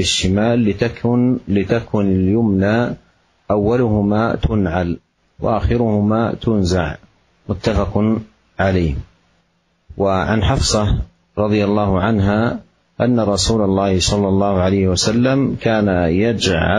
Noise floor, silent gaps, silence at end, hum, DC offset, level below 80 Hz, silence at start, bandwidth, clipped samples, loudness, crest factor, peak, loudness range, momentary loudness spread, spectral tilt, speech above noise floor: -62 dBFS; none; 0 s; none; under 0.1%; -32 dBFS; 0 s; 11.5 kHz; under 0.1%; -17 LUFS; 14 dB; -2 dBFS; 4 LU; 6 LU; -5.5 dB/octave; 46 dB